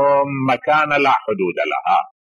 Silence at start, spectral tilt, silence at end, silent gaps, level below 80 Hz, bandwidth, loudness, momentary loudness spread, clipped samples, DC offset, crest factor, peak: 0 s; -6.5 dB/octave; 0.3 s; none; -64 dBFS; 11 kHz; -17 LUFS; 5 LU; under 0.1%; under 0.1%; 12 dB; -6 dBFS